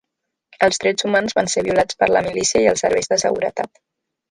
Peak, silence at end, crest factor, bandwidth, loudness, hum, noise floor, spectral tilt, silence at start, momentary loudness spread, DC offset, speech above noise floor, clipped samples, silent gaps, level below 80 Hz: -2 dBFS; 0.65 s; 18 dB; 11.5 kHz; -18 LUFS; none; -79 dBFS; -2.5 dB/octave; 0.6 s; 6 LU; under 0.1%; 61 dB; under 0.1%; none; -52 dBFS